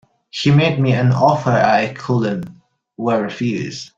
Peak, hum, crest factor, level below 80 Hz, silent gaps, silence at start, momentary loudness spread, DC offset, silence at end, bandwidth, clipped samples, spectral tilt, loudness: -2 dBFS; none; 16 dB; -52 dBFS; none; 0.35 s; 11 LU; under 0.1%; 0.1 s; 7.6 kHz; under 0.1%; -7 dB/octave; -17 LUFS